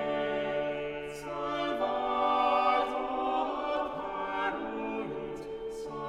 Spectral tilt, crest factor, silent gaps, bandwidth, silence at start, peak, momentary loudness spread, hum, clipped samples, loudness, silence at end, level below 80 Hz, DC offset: -5 dB/octave; 16 dB; none; 12.5 kHz; 0 s; -14 dBFS; 12 LU; none; under 0.1%; -32 LUFS; 0 s; -58 dBFS; under 0.1%